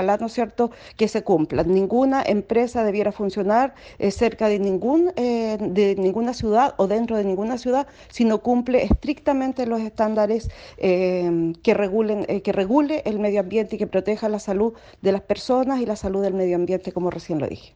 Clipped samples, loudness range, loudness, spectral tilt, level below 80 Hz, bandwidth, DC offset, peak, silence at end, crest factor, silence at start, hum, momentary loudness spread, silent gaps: under 0.1%; 2 LU; -22 LUFS; -7 dB/octave; -42 dBFS; 9.4 kHz; under 0.1%; -4 dBFS; 0.1 s; 16 dB; 0 s; none; 6 LU; none